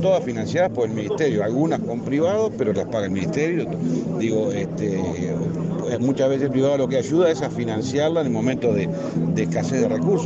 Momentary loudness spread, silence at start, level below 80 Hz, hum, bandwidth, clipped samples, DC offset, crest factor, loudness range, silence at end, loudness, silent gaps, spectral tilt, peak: 5 LU; 0 s; -56 dBFS; none; 8 kHz; under 0.1%; under 0.1%; 14 dB; 2 LU; 0 s; -22 LUFS; none; -7 dB/octave; -8 dBFS